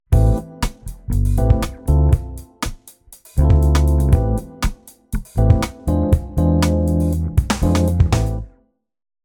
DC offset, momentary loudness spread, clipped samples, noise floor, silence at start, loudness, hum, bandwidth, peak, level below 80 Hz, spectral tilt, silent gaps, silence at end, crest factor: under 0.1%; 13 LU; under 0.1%; -58 dBFS; 0.1 s; -18 LUFS; none; 18 kHz; -2 dBFS; -22 dBFS; -7 dB/octave; none; 0.75 s; 16 dB